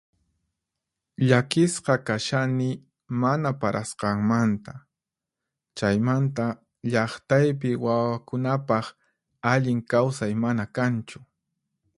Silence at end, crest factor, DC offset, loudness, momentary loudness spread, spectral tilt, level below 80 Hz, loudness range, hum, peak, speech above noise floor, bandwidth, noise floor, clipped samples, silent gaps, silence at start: 0.75 s; 22 dB; under 0.1%; -25 LUFS; 9 LU; -6.5 dB/octave; -60 dBFS; 2 LU; none; -2 dBFS; 64 dB; 11.5 kHz; -88 dBFS; under 0.1%; none; 1.2 s